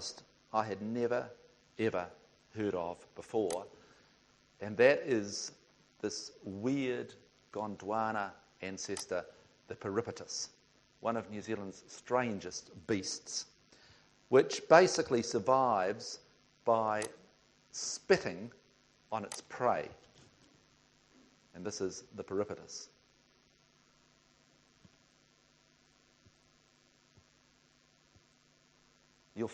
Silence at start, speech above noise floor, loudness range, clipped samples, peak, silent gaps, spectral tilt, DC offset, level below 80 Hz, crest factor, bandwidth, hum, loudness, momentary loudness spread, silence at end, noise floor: 0 s; 35 dB; 13 LU; under 0.1%; -8 dBFS; none; -4 dB/octave; under 0.1%; -74 dBFS; 30 dB; 9.4 kHz; none; -35 LUFS; 18 LU; 0 s; -69 dBFS